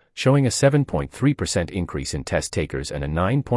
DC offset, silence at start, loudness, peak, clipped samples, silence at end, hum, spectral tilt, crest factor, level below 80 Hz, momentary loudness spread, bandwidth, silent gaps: under 0.1%; 0.15 s; -22 LUFS; -4 dBFS; under 0.1%; 0 s; none; -5.5 dB/octave; 18 dB; -40 dBFS; 9 LU; 12 kHz; none